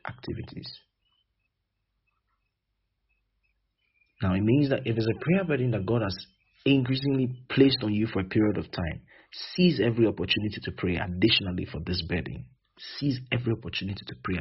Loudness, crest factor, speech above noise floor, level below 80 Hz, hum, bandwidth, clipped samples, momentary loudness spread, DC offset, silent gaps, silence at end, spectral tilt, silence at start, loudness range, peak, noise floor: -27 LUFS; 22 dB; 53 dB; -52 dBFS; none; 6 kHz; under 0.1%; 15 LU; under 0.1%; none; 0 s; -5 dB/octave; 0.05 s; 5 LU; -6 dBFS; -80 dBFS